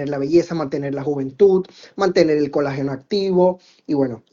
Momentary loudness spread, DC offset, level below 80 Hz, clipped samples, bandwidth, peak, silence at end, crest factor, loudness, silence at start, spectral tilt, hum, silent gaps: 9 LU; under 0.1%; -56 dBFS; under 0.1%; 7.4 kHz; -2 dBFS; 0.15 s; 18 dB; -19 LUFS; 0 s; -7 dB/octave; none; none